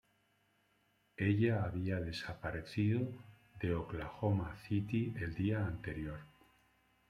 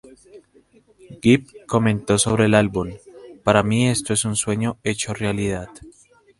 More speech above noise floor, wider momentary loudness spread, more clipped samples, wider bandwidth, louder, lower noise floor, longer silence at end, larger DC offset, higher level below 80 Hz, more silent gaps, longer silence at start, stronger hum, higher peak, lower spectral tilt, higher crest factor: about the same, 39 dB vs 36 dB; about the same, 10 LU vs 10 LU; neither; about the same, 10.5 kHz vs 11.5 kHz; second, -38 LUFS vs -20 LUFS; first, -75 dBFS vs -55 dBFS; first, 0.8 s vs 0.5 s; neither; second, -60 dBFS vs -46 dBFS; neither; first, 1.2 s vs 0.35 s; first, 50 Hz at -55 dBFS vs none; second, -20 dBFS vs 0 dBFS; first, -8 dB/octave vs -5 dB/octave; about the same, 18 dB vs 20 dB